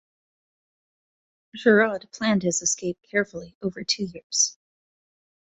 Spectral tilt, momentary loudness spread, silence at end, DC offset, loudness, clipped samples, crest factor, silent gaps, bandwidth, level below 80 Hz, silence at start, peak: -3 dB/octave; 13 LU; 1.1 s; under 0.1%; -24 LUFS; under 0.1%; 22 dB; 3.55-3.61 s, 4.23-4.30 s; 8.4 kHz; -64 dBFS; 1.55 s; -4 dBFS